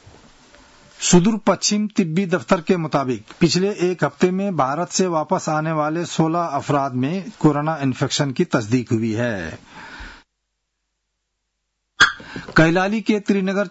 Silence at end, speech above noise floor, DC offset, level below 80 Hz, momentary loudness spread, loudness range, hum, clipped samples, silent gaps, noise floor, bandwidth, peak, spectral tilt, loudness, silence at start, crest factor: 0 s; 56 dB; under 0.1%; -50 dBFS; 8 LU; 6 LU; none; under 0.1%; none; -75 dBFS; 8 kHz; -2 dBFS; -5 dB/octave; -19 LUFS; 1 s; 18 dB